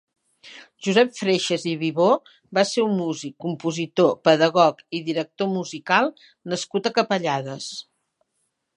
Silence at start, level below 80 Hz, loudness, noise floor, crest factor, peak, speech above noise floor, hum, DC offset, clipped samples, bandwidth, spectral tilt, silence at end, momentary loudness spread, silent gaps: 0.45 s; -74 dBFS; -22 LUFS; -74 dBFS; 20 dB; -2 dBFS; 53 dB; none; under 0.1%; under 0.1%; 11 kHz; -4.5 dB/octave; 0.95 s; 12 LU; none